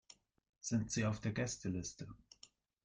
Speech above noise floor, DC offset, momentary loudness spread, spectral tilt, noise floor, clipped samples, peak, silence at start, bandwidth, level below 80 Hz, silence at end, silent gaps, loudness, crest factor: 27 dB; under 0.1%; 21 LU; -5 dB/octave; -67 dBFS; under 0.1%; -24 dBFS; 0.65 s; 10 kHz; -66 dBFS; 0.4 s; none; -40 LUFS; 18 dB